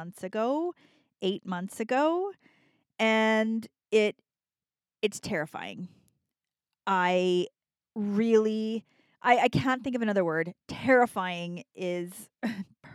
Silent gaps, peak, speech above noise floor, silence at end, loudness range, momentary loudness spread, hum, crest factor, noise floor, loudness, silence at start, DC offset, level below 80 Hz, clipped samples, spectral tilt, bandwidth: none; -8 dBFS; over 62 dB; 0.05 s; 5 LU; 14 LU; none; 22 dB; under -90 dBFS; -28 LUFS; 0 s; under 0.1%; -68 dBFS; under 0.1%; -5.5 dB/octave; 14 kHz